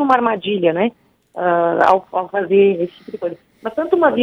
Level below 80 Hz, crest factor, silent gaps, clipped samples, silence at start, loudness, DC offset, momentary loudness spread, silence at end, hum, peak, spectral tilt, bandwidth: -62 dBFS; 16 dB; none; under 0.1%; 0 s; -17 LUFS; under 0.1%; 13 LU; 0 s; none; -2 dBFS; -7.5 dB/octave; 6.6 kHz